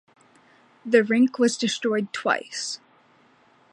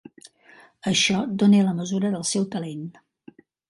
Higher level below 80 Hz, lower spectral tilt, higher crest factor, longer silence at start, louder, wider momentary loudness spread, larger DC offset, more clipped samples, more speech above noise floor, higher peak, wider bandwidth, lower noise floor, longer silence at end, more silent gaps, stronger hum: second, -78 dBFS vs -64 dBFS; about the same, -3.5 dB/octave vs -4.5 dB/octave; about the same, 20 dB vs 18 dB; about the same, 0.85 s vs 0.85 s; about the same, -23 LUFS vs -22 LUFS; second, 12 LU vs 15 LU; neither; neither; first, 36 dB vs 31 dB; about the same, -6 dBFS vs -6 dBFS; about the same, 11.5 kHz vs 11.5 kHz; first, -58 dBFS vs -53 dBFS; first, 0.95 s vs 0.8 s; neither; neither